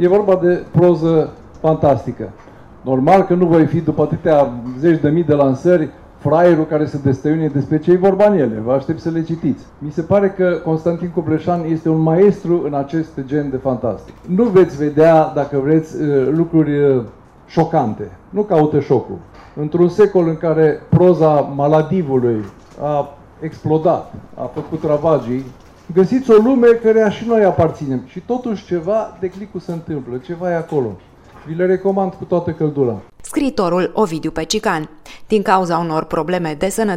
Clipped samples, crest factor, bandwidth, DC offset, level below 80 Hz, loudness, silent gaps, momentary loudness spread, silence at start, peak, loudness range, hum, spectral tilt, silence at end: under 0.1%; 16 dB; 14 kHz; under 0.1%; -46 dBFS; -16 LUFS; none; 13 LU; 0 s; 0 dBFS; 5 LU; none; -7.5 dB/octave; 0 s